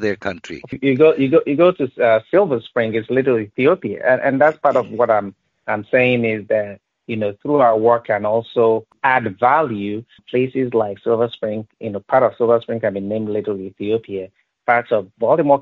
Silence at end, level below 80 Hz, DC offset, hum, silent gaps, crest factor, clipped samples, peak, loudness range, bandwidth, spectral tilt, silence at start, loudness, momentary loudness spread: 0 s; -60 dBFS; under 0.1%; none; none; 16 dB; under 0.1%; 0 dBFS; 3 LU; 7.4 kHz; -5 dB/octave; 0 s; -18 LUFS; 12 LU